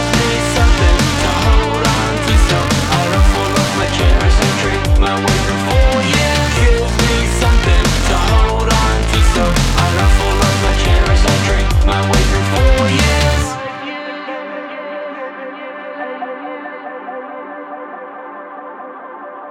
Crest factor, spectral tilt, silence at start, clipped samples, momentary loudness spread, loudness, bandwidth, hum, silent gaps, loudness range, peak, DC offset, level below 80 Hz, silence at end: 14 dB; -4.5 dB/octave; 0 s; under 0.1%; 16 LU; -14 LUFS; 15 kHz; none; none; 13 LU; 0 dBFS; under 0.1%; -16 dBFS; 0 s